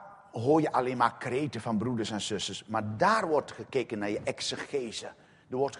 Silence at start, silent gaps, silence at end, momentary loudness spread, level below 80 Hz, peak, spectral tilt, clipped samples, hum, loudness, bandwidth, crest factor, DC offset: 0 s; none; 0 s; 9 LU; -68 dBFS; -10 dBFS; -5 dB/octave; under 0.1%; none; -30 LUFS; 10.5 kHz; 22 dB; under 0.1%